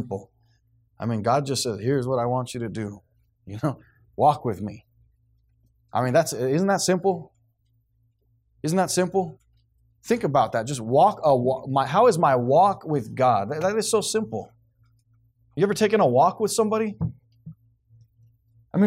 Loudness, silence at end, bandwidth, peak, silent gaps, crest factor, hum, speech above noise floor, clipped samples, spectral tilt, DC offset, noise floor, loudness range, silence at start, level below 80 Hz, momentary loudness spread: -23 LUFS; 0 s; 16 kHz; -8 dBFS; none; 16 dB; none; 45 dB; under 0.1%; -5.5 dB/octave; under 0.1%; -67 dBFS; 7 LU; 0 s; -60 dBFS; 14 LU